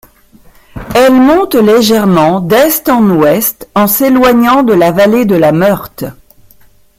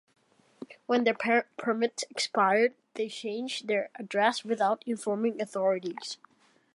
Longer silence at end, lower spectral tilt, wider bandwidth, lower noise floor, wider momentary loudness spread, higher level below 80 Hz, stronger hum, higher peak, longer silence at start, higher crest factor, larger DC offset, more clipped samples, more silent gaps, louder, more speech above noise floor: first, 0.85 s vs 0.6 s; first, -5.5 dB/octave vs -3.5 dB/octave; first, 16.5 kHz vs 11.5 kHz; second, -42 dBFS vs -62 dBFS; second, 7 LU vs 12 LU; first, -40 dBFS vs -84 dBFS; neither; first, 0 dBFS vs -10 dBFS; first, 0.75 s vs 0.6 s; second, 8 dB vs 20 dB; neither; neither; neither; first, -8 LUFS vs -29 LUFS; about the same, 35 dB vs 33 dB